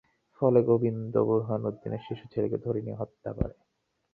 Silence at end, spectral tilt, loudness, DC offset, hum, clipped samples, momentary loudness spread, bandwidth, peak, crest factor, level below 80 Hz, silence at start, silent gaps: 0.65 s; -11.5 dB/octave; -29 LUFS; under 0.1%; none; under 0.1%; 13 LU; 4.5 kHz; -10 dBFS; 20 dB; -50 dBFS; 0.4 s; none